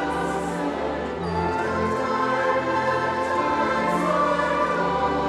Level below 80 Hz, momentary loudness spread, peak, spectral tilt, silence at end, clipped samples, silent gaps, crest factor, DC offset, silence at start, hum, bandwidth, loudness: -46 dBFS; 5 LU; -10 dBFS; -5.5 dB/octave; 0 s; under 0.1%; none; 14 dB; under 0.1%; 0 s; none; 13.5 kHz; -23 LUFS